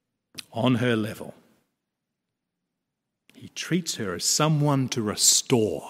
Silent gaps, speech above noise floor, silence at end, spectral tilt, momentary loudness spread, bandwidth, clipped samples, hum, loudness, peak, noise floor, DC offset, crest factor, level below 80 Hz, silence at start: none; 59 dB; 0 s; -3.5 dB/octave; 22 LU; 16 kHz; under 0.1%; none; -23 LUFS; -6 dBFS; -83 dBFS; under 0.1%; 20 dB; -66 dBFS; 0.35 s